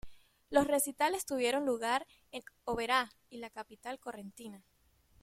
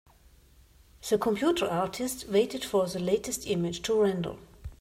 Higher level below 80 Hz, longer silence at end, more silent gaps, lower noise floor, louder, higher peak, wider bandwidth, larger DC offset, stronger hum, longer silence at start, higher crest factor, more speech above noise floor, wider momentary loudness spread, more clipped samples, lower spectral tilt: second, -64 dBFS vs -54 dBFS; first, 0.65 s vs 0.05 s; neither; first, -68 dBFS vs -58 dBFS; second, -33 LUFS vs -29 LUFS; about the same, -14 dBFS vs -14 dBFS; about the same, 16.5 kHz vs 16 kHz; neither; neither; second, 0.05 s vs 1.05 s; first, 22 dB vs 16 dB; about the same, 33 dB vs 30 dB; first, 17 LU vs 9 LU; neither; second, -2.5 dB/octave vs -4.5 dB/octave